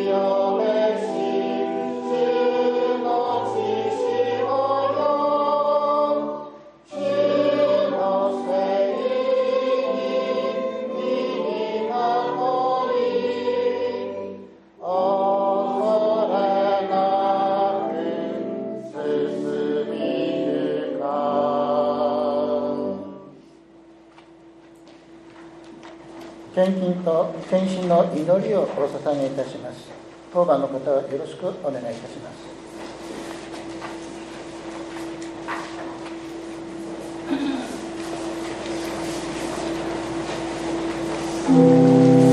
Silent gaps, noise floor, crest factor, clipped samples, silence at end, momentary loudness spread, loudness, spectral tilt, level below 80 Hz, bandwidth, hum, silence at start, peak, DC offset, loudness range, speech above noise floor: none; -48 dBFS; 18 dB; under 0.1%; 0 s; 14 LU; -22 LUFS; -6.5 dB/octave; -58 dBFS; 12 kHz; none; 0 s; -4 dBFS; under 0.1%; 11 LU; 26 dB